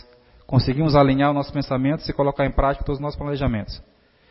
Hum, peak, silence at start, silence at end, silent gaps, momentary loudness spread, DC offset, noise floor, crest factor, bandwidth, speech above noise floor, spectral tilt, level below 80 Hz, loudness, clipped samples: none; -4 dBFS; 0.5 s; 0.5 s; none; 10 LU; under 0.1%; -48 dBFS; 18 dB; 5.8 kHz; 28 dB; -11 dB/octave; -34 dBFS; -21 LUFS; under 0.1%